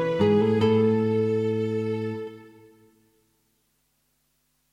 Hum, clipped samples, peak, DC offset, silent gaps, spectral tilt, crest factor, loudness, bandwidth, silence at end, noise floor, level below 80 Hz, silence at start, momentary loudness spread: none; under 0.1%; -10 dBFS; under 0.1%; none; -8.5 dB/octave; 16 dB; -24 LUFS; 7.8 kHz; 2.25 s; -71 dBFS; -64 dBFS; 0 s; 11 LU